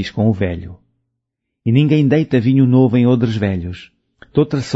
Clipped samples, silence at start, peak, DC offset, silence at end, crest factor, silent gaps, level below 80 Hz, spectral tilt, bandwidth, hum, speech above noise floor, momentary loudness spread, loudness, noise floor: under 0.1%; 0 s; -2 dBFS; under 0.1%; 0 s; 14 dB; none; -46 dBFS; -8.5 dB/octave; 8 kHz; none; 62 dB; 13 LU; -15 LUFS; -77 dBFS